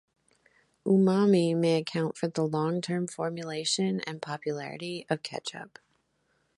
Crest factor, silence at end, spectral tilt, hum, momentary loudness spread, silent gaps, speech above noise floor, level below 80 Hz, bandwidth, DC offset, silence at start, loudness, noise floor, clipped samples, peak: 18 dB; 0.9 s; -5.5 dB/octave; none; 14 LU; none; 45 dB; -74 dBFS; 11.5 kHz; under 0.1%; 0.85 s; -29 LUFS; -73 dBFS; under 0.1%; -12 dBFS